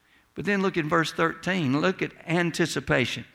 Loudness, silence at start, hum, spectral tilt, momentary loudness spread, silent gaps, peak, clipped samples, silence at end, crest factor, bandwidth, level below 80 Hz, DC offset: -25 LUFS; 0.35 s; none; -5 dB/octave; 4 LU; none; -8 dBFS; under 0.1%; 0.1 s; 18 dB; 16 kHz; -56 dBFS; under 0.1%